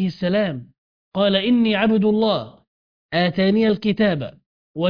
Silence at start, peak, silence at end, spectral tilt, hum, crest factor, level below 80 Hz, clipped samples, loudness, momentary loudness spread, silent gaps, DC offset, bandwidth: 0 s; -4 dBFS; 0 s; -8.5 dB/octave; none; 16 dB; -54 dBFS; under 0.1%; -19 LUFS; 14 LU; 0.78-1.12 s, 2.67-3.09 s, 4.46-4.75 s; under 0.1%; 5.2 kHz